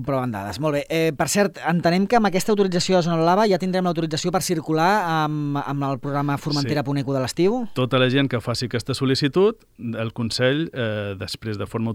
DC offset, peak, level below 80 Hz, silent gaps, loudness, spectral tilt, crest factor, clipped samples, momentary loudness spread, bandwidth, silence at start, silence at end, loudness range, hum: under 0.1%; -6 dBFS; -54 dBFS; none; -22 LUFS; -5.5 dB/octave; 16 dB; under 0.1%; 8 LU; 17 kHz; 0 s; 0 s; 3 LU; none